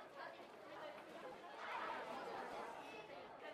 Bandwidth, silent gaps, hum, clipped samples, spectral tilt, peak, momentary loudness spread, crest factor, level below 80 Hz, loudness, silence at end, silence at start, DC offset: 15 kHz; none; none; under 0.1%; -3.5 dB/octave; -36 dBFS; 8 LU; 16 dB; -86 dBFS; -51 LUFS; 0 s; 0 s; under 0.1%